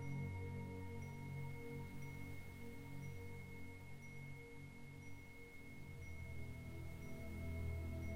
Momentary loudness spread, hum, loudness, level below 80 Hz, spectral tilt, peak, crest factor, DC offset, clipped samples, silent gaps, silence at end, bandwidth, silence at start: 9 LU; none; -52 LUFS; -58 dBFS; -7 dB/octave; -34 dBFS; 14 dB; under 0.1%; under 0.1%; none; 0 s; 16 kHz; 0 s